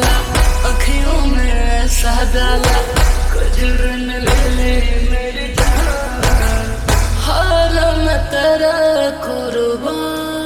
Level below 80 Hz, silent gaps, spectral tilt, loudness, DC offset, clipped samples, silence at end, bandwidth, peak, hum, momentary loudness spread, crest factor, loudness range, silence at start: -14 dBFS; none; -4.5 dB/octave; -16 LUFS; under 0.1%; under 0.1%; 0 s; 16 kHz; -2 dBFS; none; 5 LU; 12 dB; 2 LU; 0 s